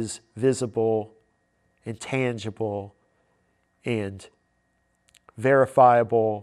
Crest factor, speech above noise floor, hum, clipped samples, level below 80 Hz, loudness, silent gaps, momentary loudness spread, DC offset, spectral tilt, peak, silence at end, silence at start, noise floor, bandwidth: 20 dB; 47 dB; none; under 0.1%; -68 dBFS; -23 LUFS; none; 21 LU; under 0.1%; -6 dB/octave; -4 dBFS; 0 s; 0 s; -70 dBFS; 12.5 kHz